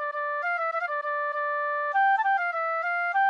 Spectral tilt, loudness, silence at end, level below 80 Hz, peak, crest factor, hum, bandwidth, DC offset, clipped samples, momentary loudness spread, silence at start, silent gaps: 0.5 dB/octave; -26 LUFS; 0 s; under -90 dBFS; -16 dBFS; 10 dB; none; 6.6 kHz; under 0.1%; under 0.1%; 6 LU; 0 s; none